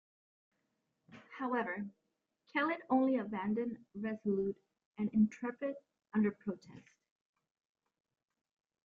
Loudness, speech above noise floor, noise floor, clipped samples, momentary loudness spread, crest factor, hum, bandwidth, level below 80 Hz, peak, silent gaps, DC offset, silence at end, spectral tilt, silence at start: -37 LUFS; 48 dB; -83 dBFS; under 0.1%; 15 LU; 20 dB; none; 7 kHz; -76 dBFS; -20 dBFS; 4.85-4.92 s; under 0.1%; 2.05 s; -8 dB/octave; 1.1 s